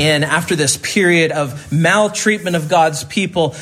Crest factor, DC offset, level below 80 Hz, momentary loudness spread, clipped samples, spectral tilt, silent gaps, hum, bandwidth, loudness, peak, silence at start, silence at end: 16 dB; under 0.1%; -52 dBFS; 6 LU; under 0.1%; -4 dB/octave; none; none; 15.5 kHz; -15 LUFS; 0 dBFS; 0 s; 0 s